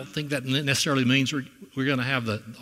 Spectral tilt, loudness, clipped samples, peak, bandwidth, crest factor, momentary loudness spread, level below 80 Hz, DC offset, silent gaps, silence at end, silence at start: -4.5 dB/octave; -25 LUFS; under 0.1%; -8 dBFS; 16 kHz; 18 dB; 10 LU; -64 dBFS; under 0.1%; none; 0 s; 0 s